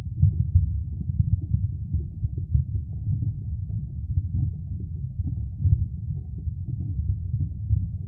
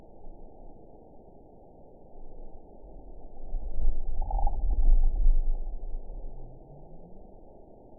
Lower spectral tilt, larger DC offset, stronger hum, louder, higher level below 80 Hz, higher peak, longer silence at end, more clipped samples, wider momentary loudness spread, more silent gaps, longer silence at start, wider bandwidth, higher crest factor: about the same, -15 dB/octave vs -14.5 dB/octave; second, under 0.1% vs 0.2%; neither; first, -28 LUFS vs -34 LUFS; about the same, -32 dBFS vs -28 dBFS; first, -6 dBFS vs -10 dBFS; second, 0 s vs 0.8 s; neither; second, 9 LU vs 24 LU; neither; second, 0 s vs 0.2 s; second, 0.8 kHz vs 1 kHz; about the same, 20 dB vs 16 dB